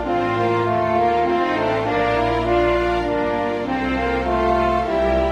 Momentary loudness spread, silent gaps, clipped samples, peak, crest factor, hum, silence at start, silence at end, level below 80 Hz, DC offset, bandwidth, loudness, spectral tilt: 3 LU; none; under 0.1%; -6 dBFS; 12 dB; none; 0 s; 0 s; -34 dBFS; under 0.1%; 9.6 kHz; -19 LUFS; -7 dB/octave